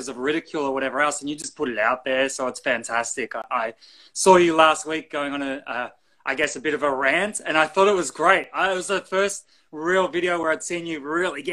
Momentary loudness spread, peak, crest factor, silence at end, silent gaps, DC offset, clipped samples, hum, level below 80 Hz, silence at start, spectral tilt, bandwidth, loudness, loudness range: 11 LU; 0 dBFS; 22 dB; 0 s; none; under 0.1%; under 0.1%; none; -62 dBFS; 0 s; -3 dB/octave; 12.5 kHz; -22 LUFS; 3 LU